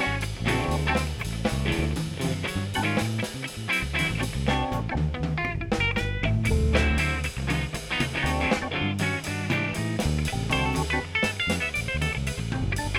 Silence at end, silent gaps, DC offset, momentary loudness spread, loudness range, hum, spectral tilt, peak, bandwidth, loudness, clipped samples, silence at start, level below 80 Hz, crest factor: 0 s; none; under 0.1%; 5 LU; 2 LU; none; -5 dB/octave; -8 dBFS; 16.5 kHz; -26 LUFS; under 0.1%; 0 s; -34 dBFS; 18 dB